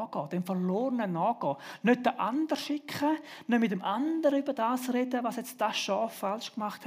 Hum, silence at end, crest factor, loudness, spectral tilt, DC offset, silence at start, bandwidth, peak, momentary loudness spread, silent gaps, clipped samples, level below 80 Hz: none; 0 s; 18 dB; -30 LUFS; -5.5 dB/octave; under 0.1%; 0 s; 16 kHz; -12 dBFS; 7 LU; none; under 0.1%; -86 dBFS